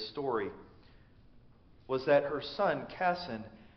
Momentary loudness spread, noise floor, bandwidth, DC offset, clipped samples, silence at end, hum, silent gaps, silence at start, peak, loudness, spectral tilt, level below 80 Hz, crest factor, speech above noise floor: 14 LU; -59 dBFS; 6.2 kHz; under 0.1%; under 0.1%; 0.15 s; none; none; 0 s; -14 dBFS; -33 LUFS; -3.5 dB/octave; -64 dBFS; 20 dB; 27 dB